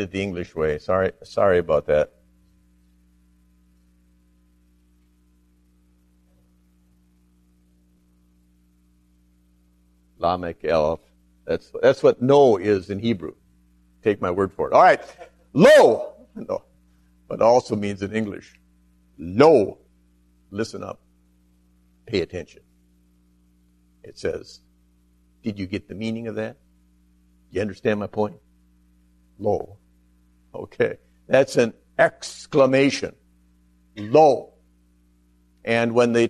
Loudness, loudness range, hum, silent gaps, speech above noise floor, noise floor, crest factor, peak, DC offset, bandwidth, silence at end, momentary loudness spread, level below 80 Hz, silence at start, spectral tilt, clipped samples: -21 LUFS; 15 LU; 60 Hz at -55 dBFS; none; 40 dB; -60 dBFS; 22 dB; -2 dBFS; under 0.1%; 13.5 kHz; 0 s; 20 LU; -54 dBFS; 0 s; -6 dB/octave; under 0.1%